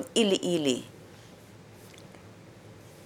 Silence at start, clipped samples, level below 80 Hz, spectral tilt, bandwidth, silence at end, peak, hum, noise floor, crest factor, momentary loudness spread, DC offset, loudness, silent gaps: 0 s; under 0.1%; -70 dBFS; -4 dB/octave; 17 kHz; 0 s; -10 dBFS; none; -51 dBFS; 22 dB; 25 LU; under 0.1%; -27 LUFS; none